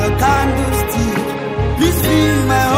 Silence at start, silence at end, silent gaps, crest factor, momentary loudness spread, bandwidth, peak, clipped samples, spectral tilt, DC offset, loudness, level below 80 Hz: 0 s; 0 s; none; 12 dB; 6 LU; 16.5 kHz; -2 dBFS; under 0.1%; -5.5 dB/octave; under 0.1%; -15 LUFS; -24 dBFS